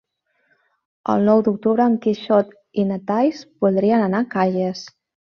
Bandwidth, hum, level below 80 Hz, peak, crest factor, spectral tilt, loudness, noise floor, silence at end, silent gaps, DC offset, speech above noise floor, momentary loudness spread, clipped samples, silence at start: 6.8 kHz; none; -64 dBFS; -4 dBFS; 16 dB; -7.5 dB/octave; -19 LUFS; -66 dBFS; 0.5 s; none; under 0.1%; 48 dB; 9 LU; under 0.1%; 1.05 s